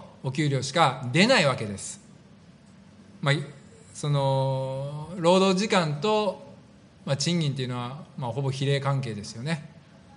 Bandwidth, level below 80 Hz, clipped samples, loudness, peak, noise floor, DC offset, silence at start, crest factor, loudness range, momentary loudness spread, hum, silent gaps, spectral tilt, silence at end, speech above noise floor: 10.5 kHz; -66 dBFS; under 0.1%; -26 LUFS; -4 dBFS; -52 dBFS; under 0.1%; 0 s; 22 dB; 4 LU; 14 LU; none; none; -5 dB/octave; 0.35 s; 27 dB